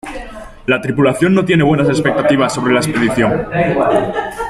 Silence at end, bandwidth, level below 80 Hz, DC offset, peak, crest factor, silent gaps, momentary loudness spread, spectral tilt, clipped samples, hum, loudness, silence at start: 0 s; 14 kHz; -38 dBFS; under 0.1%; -2 dBFS; 12 dB; none; 8 LU; -6 dB/octave; under 0.1%; none; -14 LUFS; 0.05 s